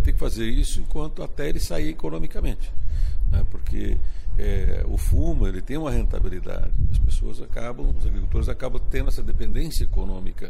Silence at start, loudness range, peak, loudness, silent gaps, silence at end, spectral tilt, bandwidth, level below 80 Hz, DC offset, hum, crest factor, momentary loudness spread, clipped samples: 0 s; 3 LU; -10 dBFS; -28 LUFS; none; 0 s; -6.5 dB/octave; 12.5 kHz; -22 dBFS; under 0.1%; none; 8 dB; 7 LU; under 0.1%